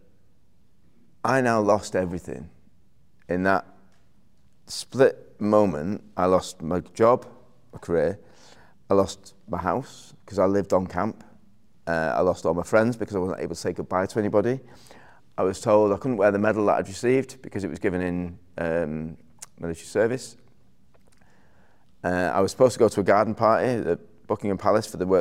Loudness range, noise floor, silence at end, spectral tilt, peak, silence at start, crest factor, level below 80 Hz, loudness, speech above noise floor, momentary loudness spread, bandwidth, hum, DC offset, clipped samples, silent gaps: 6 LU; -64 dBFS; 0 s; -6 dB/octave; -6 dBFS; 1.25 s; 20 dB; -58 dBFS; -24 LUFS; 41 dB; 14 LU; 15.5 kHz; none; 0.3%; under 0.1%; none